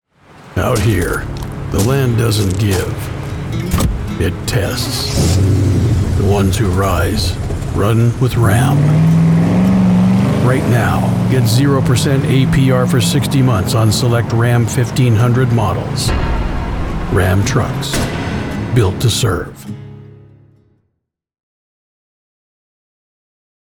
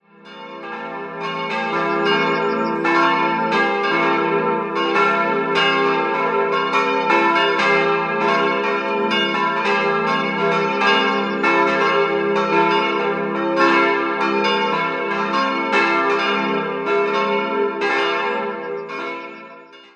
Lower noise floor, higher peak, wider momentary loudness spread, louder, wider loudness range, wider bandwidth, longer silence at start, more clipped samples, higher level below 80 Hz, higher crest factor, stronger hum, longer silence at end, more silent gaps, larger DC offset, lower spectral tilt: first, -74 dBFS vs -41 dBFS; about the same, -2 dBFS vs -2 dBFS; about the same, 9 LU vs 10 LU; first, -14 LUFS vs -18 LUFS; first, 5 LU vs 2 LU; first, 18.5 kHz vs 8.8 kHz; first, 0.45 s vs 0.25 s; neither; first, -28 dBFS vs -70 dBFS; about the same, 12 dB vs 16 dB; neither; first, 3.65 s vs 0.15 s; neither; neither; about the same, -6 dB/octave vs -5 dB/octave